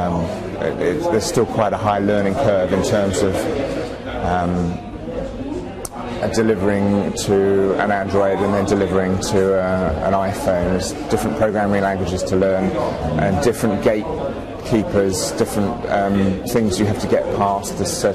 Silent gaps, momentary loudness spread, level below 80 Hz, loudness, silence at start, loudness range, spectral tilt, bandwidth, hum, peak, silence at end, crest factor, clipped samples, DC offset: none; 7 LU; -38 dBFS; -19 LUFS; 0 s; 3 LU; -5.5 dB/octave; 14.5 kHz; none; -6 dBFS; 0 s; 12 dB; under 0.1%; under 0.1%